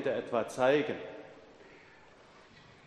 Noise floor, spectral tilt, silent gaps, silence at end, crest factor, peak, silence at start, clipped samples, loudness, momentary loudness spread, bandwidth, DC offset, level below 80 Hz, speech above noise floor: -58 dBFS; -5 dB/octave; none; 0.25 s; 20 dB; -14 dBFS; 0 s; under 0.1%; -31 LUFS; 24 LU; 11.5 kHz; under 0.1%; -74 dBFS; 27 dB